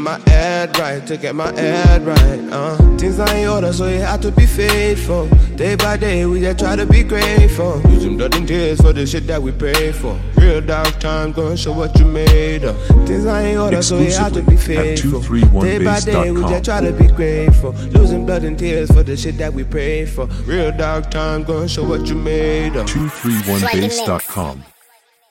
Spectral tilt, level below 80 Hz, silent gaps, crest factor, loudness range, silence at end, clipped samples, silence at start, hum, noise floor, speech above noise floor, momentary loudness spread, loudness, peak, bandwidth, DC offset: -6 dB/octave; -16 dBFS; none; 12 dB; 4 LU; 0.7 s; under 0.1%; 0 s; none; -53 dBFS; 40 dB; 8 LU; -15 LUFS; 0 dBFS; 16.5 kHz; under 0.1%